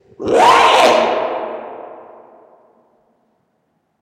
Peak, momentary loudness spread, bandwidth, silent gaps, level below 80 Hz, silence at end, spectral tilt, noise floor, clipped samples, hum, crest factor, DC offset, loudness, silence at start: 0 dBFS; 24 LU; 16 kHz; none; -54 dBFS; 2.05 s; -2.5 dB/octave; -65 dBFS; under 0.1%; none; 16 dB; under 0.1%; -12 LUFS; 0.2 s